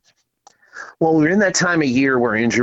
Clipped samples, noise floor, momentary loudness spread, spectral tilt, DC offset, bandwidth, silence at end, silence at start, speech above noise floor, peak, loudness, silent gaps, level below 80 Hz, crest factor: under 0.1%; -55 dBFS; 11 LU; -4.5 dB/octave; under 0.1%; 8.2 kHz; 0 s; 0.75 s; 39 dB; -6 dBFS; -16 LUFS; none; -54 dBFS; 12 dB